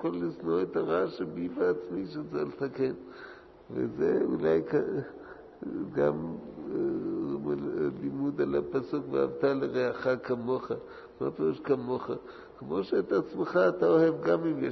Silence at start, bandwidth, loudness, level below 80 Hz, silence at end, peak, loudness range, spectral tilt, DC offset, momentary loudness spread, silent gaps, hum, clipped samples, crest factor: 0 s; 6.2 kHz; -30 LUFS; -64 dBFS; 0 s; -12 dBFS; 4 LU; -8.5 dB/octave; under 0.1%; 13 LU; none; none; under 0.1%; 18 dB